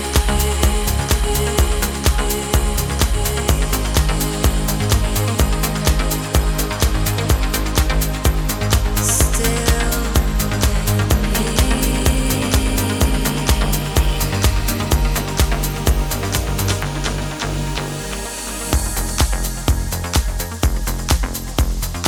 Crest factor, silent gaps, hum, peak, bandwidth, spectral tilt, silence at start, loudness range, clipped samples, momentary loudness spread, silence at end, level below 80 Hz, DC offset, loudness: 16 dB; none; none; 0 dBFS; over 20 kHz; -4 dB/octave; 0 s; 4 LU; under 0.1%; 4 LU; 0 s; -20 dBFS; under 0.1%; -19 LUFS